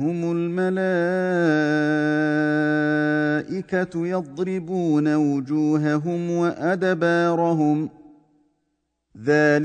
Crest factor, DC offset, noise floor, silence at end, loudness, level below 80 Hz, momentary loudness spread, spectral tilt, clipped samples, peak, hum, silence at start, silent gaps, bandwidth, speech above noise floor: 14 dB; under 0.1%; -74 dBFS; 0 s; -22 LUFS; -66 dBFS; 6 LU; -7.5 dB/octave; under 0.1%; -6 dBFS; none; 0 s; none; 9 kHz; 53 dB